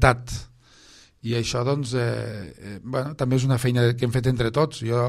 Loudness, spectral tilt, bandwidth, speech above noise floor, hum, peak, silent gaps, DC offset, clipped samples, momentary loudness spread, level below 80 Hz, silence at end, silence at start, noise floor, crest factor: -24 LUFS; -6 dB/octave; 13.5 kHz; 29 dB; none; -2 dBFS; none; under 0.1%; under 0.1%; 15 LU; -40 dBFS; 0 s; 0 s; -52 dBFS; 22 dB